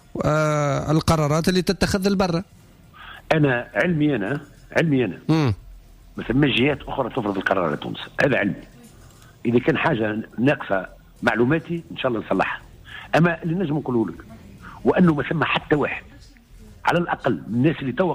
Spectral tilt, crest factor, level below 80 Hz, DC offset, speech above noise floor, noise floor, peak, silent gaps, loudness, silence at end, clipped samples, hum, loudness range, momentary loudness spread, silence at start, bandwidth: -6.5 dB/octave; 16 dB; -46 dBFS; under 0.1%; 26 dB; -47 dBFS; -6 dBFS; none; -22 LUFS; 0 s; under 0.1%; none; 2 LU; 11 LU; 0.15 s; 15.5 kHz